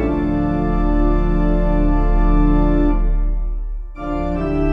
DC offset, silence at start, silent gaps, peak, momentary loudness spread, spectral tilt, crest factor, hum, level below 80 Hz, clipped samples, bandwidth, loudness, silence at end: under 0.1%; 0 s; none; -4 dBFS; 10 LU; -10 dB/octave; 12 dB; none; -18 dBFS; under 0.1%; 3.7 kHz; -19 LUFS; 0 s